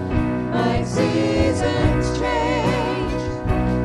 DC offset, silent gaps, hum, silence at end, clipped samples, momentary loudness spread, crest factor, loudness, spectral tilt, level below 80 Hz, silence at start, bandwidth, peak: under 0.1%; none; none; 0 s; under 0.1%; 4 LU; 16 dB; -21 LUFS; -6.5 dB/octave; -30 dBFS; 0 s; 12 kHz; -4 dBFS